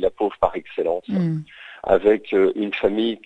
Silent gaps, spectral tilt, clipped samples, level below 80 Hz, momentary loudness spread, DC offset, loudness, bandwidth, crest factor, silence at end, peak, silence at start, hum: none; -8.5 dB/octave; under 0.1%; -48 dBFS; 9 LU; under 0.1%; -21 LUFS; 8 kHz; 20 dB; 0.1 s; -2 dBFS; 0 s; none